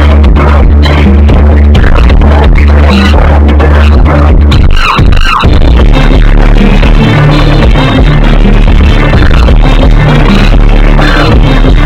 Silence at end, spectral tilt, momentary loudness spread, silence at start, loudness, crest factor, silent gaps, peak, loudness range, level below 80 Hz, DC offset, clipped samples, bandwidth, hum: 0 s; -7.5 dB/octave; 2 LU; 0 s; -5 LUFS; 2 dB; none; 0 dBFS; 1 LU; -4 dBFS; under 0.1%; 50%; 8.2 kHz; none